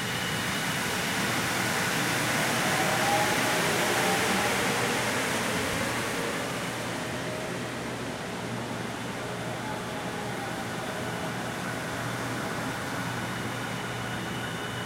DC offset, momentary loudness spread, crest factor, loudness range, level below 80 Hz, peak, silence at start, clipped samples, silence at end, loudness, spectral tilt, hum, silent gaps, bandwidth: under 0.1%; 9 LU; 16 dB; 8 LU; -56 dBFS; -12 dBFS; 0 s; under 0.1%; 0 s; -29 LUFS; -3 dB/octave; none; none; 16 kHz